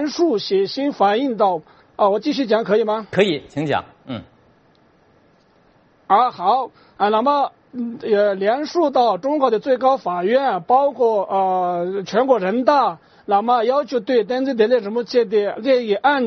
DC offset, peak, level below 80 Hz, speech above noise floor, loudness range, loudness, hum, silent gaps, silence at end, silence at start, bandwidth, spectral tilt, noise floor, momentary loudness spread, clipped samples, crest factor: under 0.1%; -2 dBFS; -64 dBFS; 37 dB; 5 LU; -18 LUFS; none; none; 0 s; 0 s; 6.6 kHz; -3.5 dB/octave; -55 dBFS; 7 LU; under 0.1%; 18 dB